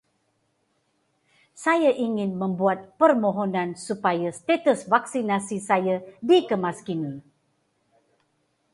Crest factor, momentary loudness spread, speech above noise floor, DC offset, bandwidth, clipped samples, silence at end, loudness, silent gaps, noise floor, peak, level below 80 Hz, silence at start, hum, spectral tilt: 20 dB; 9 LU; 48 dB; under 0.1%; 11.5 kHz; under 0.1%; 1.55 s; -24 LUFS; none; -71 dBFS; -4 dBFS; -72 dBFS; 1.55 s; none; -5.5 dB/octave